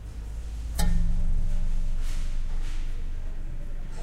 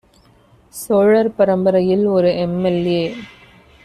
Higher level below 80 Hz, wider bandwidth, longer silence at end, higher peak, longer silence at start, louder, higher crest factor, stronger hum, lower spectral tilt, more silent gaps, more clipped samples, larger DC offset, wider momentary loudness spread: first, -26 dBFS vs -52 dBFS; second, 13 kHz vs 14.5 kHz; second, 0 s vs 0.6 s; second, -12 dBFS vs -2 dBFS; second, 0 s vs 0.75 s; second, -34 LUFS vs -16 LUFS; about the same, 14 dB vs 14 dB; neither; second, -5.5 dB/octave vs -7 dB/octave; neither; neither; neither; second, 11 LU vs 14 LU